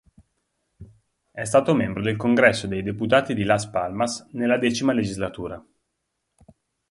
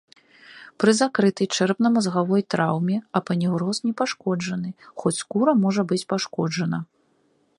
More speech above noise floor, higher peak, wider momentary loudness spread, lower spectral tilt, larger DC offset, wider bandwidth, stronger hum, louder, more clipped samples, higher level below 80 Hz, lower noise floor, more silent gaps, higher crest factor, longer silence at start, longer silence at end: first, 56 dB vs 42 dB; about the same, -2 dBFS vs -4 dBFS; first, 13 LU vs 8 LU; about the same, -5 dB/octave vs -5.5 dB/octave; neither; about the same, 11.5 kHz vs 11.5 kHz; neither; about the same, -22 LUFS vs -23 LUFS; neither; first, -52 dBFS vs -68 dBFS; first, -78 dBFS vs -65 dBFS; neither; about the same, 22 dB vs 18 dB; first, 0.8 s vs 0.5 s; first, 1.3 s vs 0.75 s